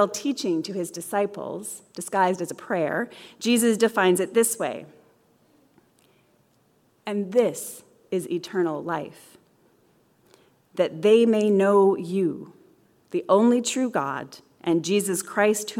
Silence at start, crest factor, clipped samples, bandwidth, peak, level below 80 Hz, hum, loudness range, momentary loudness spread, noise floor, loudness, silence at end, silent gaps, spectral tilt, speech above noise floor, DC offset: 0 s; 18 dB; under 0.1%; 17.5 kHz; -6 dBFS; -76 dBFS; none; 9 LU; 16 LU; -64 dBFS; -24 LUFS; 0 s; none; -4.5 dB/octave; 40 dB; under 0.1%